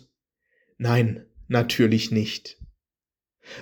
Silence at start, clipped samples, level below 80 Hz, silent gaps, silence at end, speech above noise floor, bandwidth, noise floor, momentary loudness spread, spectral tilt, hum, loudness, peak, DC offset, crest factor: 0.8 s; under 0.1%; -56 dBFS; none; 0 s; over 68 dB; over 20 kHz; under -90 dBFS; 18 LU; -6 dB/octave; none; -23 LUFS; -6 dBFS; under 0.1%; 20 dB